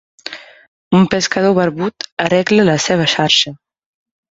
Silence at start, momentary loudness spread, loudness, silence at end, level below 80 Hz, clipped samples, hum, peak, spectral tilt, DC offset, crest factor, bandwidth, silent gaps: 0.25 s; 16 LU; -14 LUFS; 0.75 s; -52 dBFS; under 0.1%; none; 0 dBFS; -4.5 dB/octave; under 0.1%; 16 dB; 7.8 kHz; 0.68-0.91 s, 2.12-2.17 s